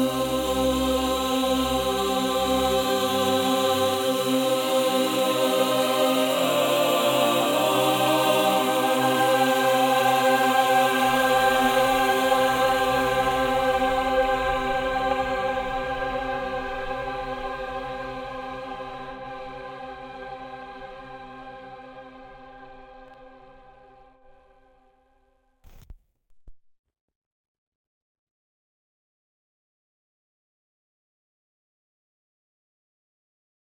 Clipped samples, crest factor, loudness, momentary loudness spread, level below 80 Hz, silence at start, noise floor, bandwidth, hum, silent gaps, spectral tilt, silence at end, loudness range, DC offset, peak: under 0.1%; 18 dB; -22 LUFS; 18 LU; -48 dBFS; 0 s; -65 dBFS; 17.5 kHz; none; none; -3.5 dB/octave; 7.2 s; 18 LU; under 0.1%; -6 dBFS